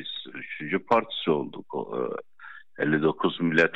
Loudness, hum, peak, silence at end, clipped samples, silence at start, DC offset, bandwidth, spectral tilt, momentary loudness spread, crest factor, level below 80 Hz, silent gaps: -27 LUFS; none; -8 dBFS; 0 s; under 0.1%; 0 s; 0.3%; 8 kHz; -6.5 dB/octave; 14 LU; 18 dB; -74 dBFS; none